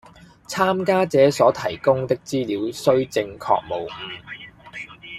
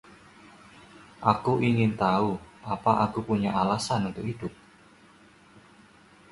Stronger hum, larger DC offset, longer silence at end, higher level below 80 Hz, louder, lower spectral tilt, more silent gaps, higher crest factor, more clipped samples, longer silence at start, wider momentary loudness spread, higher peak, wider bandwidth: neither; neither; second, 0 s vs 1.8 s; about the same, -58 dBFS vs -56 dBFS; first, -21 LUFS vs -27 LUFS; about the same, -5.5 dB/octave vs -6.5 dB/octave; neither; about the same, 20 dB vs 24 dB; neither; second, 0.5 s vs 1 s; first, 19 LU vs 11 LU; first, -2 dBFS vs -6 dBFS; first, 14.5 kHz vs 11.5 kHz